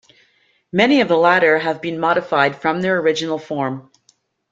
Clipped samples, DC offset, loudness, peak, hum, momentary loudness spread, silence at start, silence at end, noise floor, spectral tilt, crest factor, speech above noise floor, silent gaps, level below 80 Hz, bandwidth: under 0.1%; under 0.1%; -17 LUFS; -2 dBFS; none; 10 LU; 0.75 s; 0.7 s; -60 dBFS; -5.5 dB/octave; 16 dB; 43 dB; none; -62 dBFS; 7.8 kHz